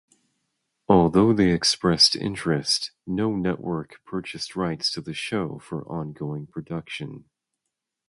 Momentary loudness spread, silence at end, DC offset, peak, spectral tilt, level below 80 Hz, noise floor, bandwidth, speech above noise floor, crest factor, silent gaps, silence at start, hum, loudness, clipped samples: 16 LU; 0.9 s; under 0.1%; -4 dBFS; -4.5 dB/octave; -52 dBFS; -83 dBFS; 11.5 kHz; 58 dB; 22 dB; none; 0.9 s; none; -23 LUFS; under 0.1%